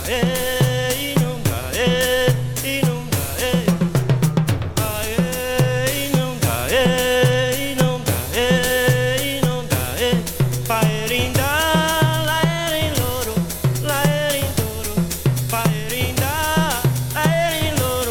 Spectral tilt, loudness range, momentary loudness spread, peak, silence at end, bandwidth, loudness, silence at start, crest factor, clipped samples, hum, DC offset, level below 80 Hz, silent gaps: -4.5 dB/octave; 2 LU; 5 LU; -2 dBFS; 0 s; over 20 kHz; -19 LUFS; 0 s; 18 dB; under 0.1%; none; under 0.1%; -36 dBFS; none